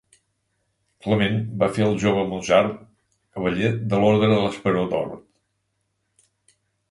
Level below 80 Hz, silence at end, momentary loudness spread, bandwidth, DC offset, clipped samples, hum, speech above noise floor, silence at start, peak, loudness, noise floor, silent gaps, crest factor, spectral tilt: -52 dBFS; 1.7 s; 13 LU; 11.5 kHz; under 0.1%; under 0.1%; none; 53 dB; 1.05 s; -4 dBFS; -21 LUFS; -74 dBFS; none; 18 dB; -6.5 dB/octave